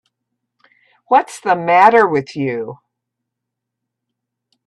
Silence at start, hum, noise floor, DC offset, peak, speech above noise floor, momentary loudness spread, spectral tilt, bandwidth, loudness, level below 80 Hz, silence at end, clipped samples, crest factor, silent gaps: 1.1 s; none; -80 dBFS; under 0.1%; 0 dBFS; 66 dB; 13 LU; -5.5 dB/octave; 12 kHz; -14 LUFS; -66 dBFS; 1.95 s; under 0.1%; 18 dB; none